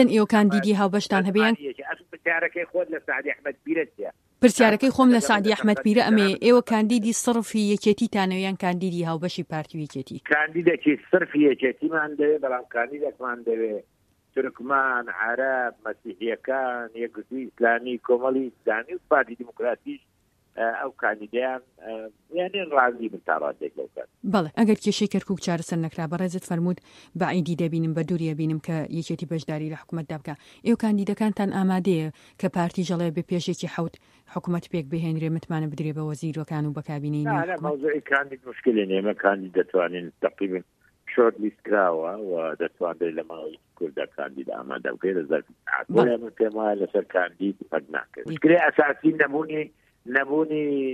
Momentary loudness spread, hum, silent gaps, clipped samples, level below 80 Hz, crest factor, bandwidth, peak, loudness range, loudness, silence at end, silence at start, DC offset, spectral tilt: 13 LU; none; none; under 0.1%; -66 dBFS; 22 dB; 14 kHz; -4 dBFS; 7 LU; -25 LUFS; 0 s; 0 s; under 0.1%; -6 dB/octave